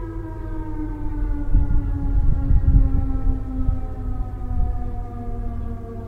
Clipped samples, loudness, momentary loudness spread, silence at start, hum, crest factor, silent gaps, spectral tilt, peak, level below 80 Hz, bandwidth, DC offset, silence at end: under 0.1%; -25 LUFS; 12 LU; 0 s; none; 16 dB; none; -11 dB/octave; -4 dBFS; -22 dBFS; 2.4 kHz; under 0.1%; 0 s